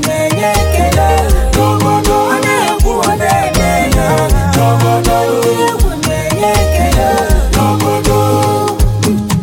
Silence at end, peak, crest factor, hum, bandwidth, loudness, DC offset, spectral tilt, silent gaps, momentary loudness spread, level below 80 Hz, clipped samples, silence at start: 0 s; 0 dBFS; 10 dB; none; 17 kHz; -11 LUFS; under 0.1%; -5 dB/octave; none; 2 LU; -16 dBFS; under 0.1%; 0 s